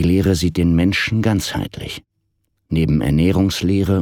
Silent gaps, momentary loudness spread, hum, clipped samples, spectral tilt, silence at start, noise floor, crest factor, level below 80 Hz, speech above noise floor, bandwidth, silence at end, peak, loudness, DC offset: none; 11 LU; none; under 0.1%; -6 dB/octave; 0 s; -69 dBFS; 14 dB; -32 dBFS; 52 dB; 17.5 kHz; 0 s; -4 dBFS; -17 LUFS; under 0.1%